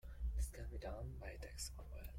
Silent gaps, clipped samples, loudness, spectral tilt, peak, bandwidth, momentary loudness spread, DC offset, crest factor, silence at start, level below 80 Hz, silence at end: none; under 0.1%; -49 LUFS; -4.5 dB/octave; -32 dBFS; 16 kHz; 7 LU; under 0.1%; 14 dB; 0.05 s; -48 dBFS; 0 s